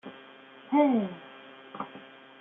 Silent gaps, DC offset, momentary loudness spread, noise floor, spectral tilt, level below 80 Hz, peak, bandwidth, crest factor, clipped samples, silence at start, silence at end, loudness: none; under 0.1%; 26 LU; -51 dBFS; -5.5 dB/octave; -82 dBFS; -10 dBFS; 3.8 kHz; 20 dB; under 0.1%; 0.05 s; 0.35 s; -28 LUFS